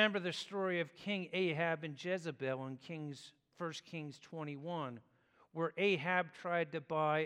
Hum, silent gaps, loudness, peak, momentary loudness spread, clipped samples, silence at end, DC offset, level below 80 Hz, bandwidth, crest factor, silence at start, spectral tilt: none; none; -39 LUFS; -18 dBFS; 13 LU; under 0.1%; 0 s; under 0.1%; -88 dBFS; 11.5 kHz; 22 dB; 0 s; -5.5 dB/octave